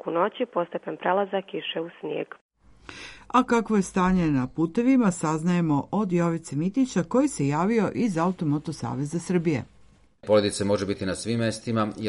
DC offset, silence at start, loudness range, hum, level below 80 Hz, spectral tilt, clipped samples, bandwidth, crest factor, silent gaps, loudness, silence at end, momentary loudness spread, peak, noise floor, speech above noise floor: under 0.1%; 0.05 s; 4 LU; none; -54 dBFS; -6 dB/octave; under 0.1%; 11.5 kHz; 20 dB; 2.41-2.49 s; -25 LUFS; 0 s; 10 LU; -6 dBFS; -55 dBFS; 31 dB